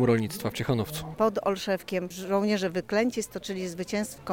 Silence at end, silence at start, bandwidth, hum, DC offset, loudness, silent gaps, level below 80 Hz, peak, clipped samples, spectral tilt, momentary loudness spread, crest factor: 0 s; 0 s; 17 kHz; none; under 0.1%; -29 LUFS; none; -56 dBFS; -12 dBFS; under 0.1%; -5.5 dB/octave; 8 LU; 16 dB